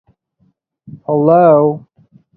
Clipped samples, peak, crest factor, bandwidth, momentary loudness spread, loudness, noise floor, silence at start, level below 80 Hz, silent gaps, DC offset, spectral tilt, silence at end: under 0.1%; 0 dBFS; 14 dB; 4.4 kHz; 19 LU; -11 LUFS; -60 dBFS; 0.95 s; -58 dBFS; none; under 0.1%; -13 dB/octave; 0.6 s